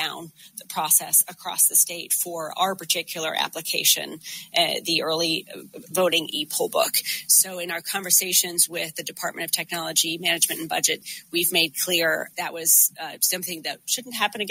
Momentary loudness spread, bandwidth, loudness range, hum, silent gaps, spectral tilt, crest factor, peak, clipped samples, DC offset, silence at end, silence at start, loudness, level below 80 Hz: 12 LU; 16.5 kHz; 2 LU; none; none; -0.5 dB/octave; 22 dB; -2 dBFS; under 0.1%; under 0.1%; 0 s; 0 s; -21 LUFS; -76 dBFS